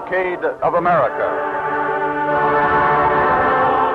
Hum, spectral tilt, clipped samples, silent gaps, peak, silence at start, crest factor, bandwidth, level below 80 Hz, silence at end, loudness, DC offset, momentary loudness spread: none; -7.5 dB/octave; under 0.1%; none; -6 dBFS; 0 s; 10 dB; 6.8 kHz; -44 dBFS; 0 s; -17 LUFS; under 0.1%; 6 LU